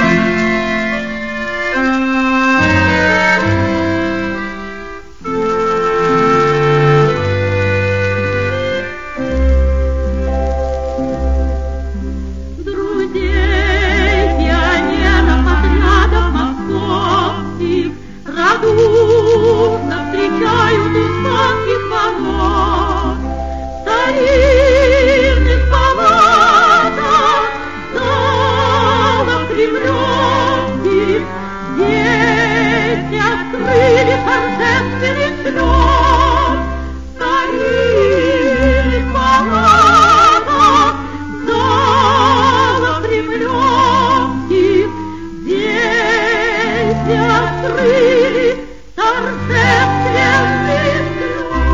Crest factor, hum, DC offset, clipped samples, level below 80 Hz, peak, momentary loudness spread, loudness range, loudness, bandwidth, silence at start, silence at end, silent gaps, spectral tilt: 12 dB; none; 2%; under 0.1%; -22 dBFS; 0 dBFS; 10 LU; 5 LU; -13 LUFS; 7.6 kHz; 0 s; 0 s; none; -5.5 dB/octave